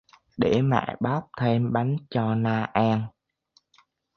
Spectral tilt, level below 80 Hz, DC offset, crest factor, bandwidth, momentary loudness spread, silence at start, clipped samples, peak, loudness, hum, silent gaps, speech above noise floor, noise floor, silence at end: -8.5 dB/octave; -58 dBFS; under 0.1%; 22 dB; 6.6 kHz; 5 LU; 0.4 s; under 0.1%; -4 dBFS; -25 LUFS; none; none; 42 dB; -66 dBFS; 1.1 s